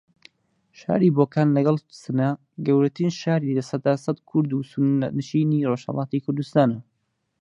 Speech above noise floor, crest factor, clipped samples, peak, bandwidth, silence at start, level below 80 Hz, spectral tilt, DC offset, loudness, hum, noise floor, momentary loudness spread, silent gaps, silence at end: 52 dB; 18 dB; under 0.1%; -4 dBFS; 9.6 kHz; 0.8 s; -66 dBFS; -8 dB/octave; under 0.1%; -23 LUFS; none; -74 dBFS; 7 LU; none; 0.6 s